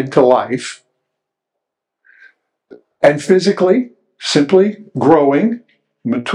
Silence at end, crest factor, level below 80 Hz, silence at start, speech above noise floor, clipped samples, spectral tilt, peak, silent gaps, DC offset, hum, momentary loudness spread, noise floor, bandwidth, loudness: 0 s; 16 dB; -62 dBFS; 0 s; 66 dB; under 0.1%; -5.5 dB/octave; 0 dBFS; none; under 0.1%; none; 14 LU; -79 dBFS; 11 kHz; -14 LUFS